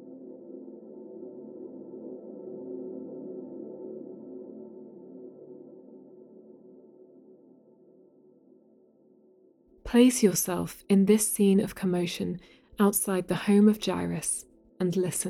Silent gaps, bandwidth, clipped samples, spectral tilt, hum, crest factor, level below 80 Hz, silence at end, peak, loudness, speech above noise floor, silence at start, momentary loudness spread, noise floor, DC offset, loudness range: none; 16 kHz; under 0.1%; -5 dB/octave; none; 20 dB; -60 dBFS; 0 s; -10 dBFS; -26 LUFS; 36 dB; 0 s; 25 LU; -61 dBFS; under 0.1%; 20 LU